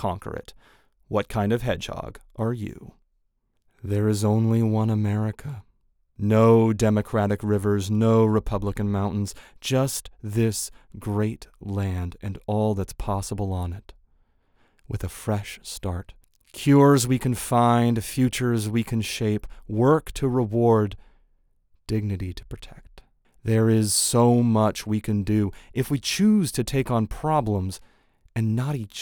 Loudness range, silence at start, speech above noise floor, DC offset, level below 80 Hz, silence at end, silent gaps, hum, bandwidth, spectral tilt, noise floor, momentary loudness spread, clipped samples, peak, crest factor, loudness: 8 LU; 0 s; 47 dB; under 0.1%; -44 dBFS; 0 s; none; none; over 20 kHz; -6 dB/octave; -70 dBFS; 15 LU; under 0.1%; -6 dBFS; 18 dB; -24 LUFS